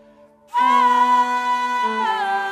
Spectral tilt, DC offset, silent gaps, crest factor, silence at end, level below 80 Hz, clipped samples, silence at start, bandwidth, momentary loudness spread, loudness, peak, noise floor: -2 dB/octave; under 0.1%; none; 12 dB; 0 s; -72 dBFS; under 0.1%; 0.55 s; 13.5 kHz; 6 LU; -18 LUFS; -6 dBFS; -50 dBFS